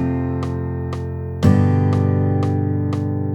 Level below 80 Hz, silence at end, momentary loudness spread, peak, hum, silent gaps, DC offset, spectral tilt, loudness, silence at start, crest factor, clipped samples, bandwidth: -40 dBFS; 0 s; 10 LU; 0 dBFS; none; none; under 0.1%; -9 dB/octave; -19 LUFS; 0 s; 18 dB; under 0.1%; 8.4 kHz